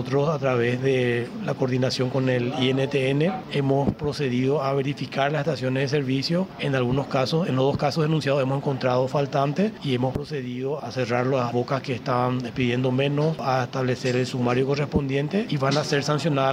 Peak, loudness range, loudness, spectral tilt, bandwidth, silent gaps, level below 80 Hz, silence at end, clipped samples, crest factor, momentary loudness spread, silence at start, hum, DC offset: -8 dBFS; 2 LU; -24 LUFS; -6.5 dB/octave; 11.5 kHz; none; -52 dBFS; 0 s; under 0.1%; 16 dB; 4 LU; 0 s; none; under 0.1%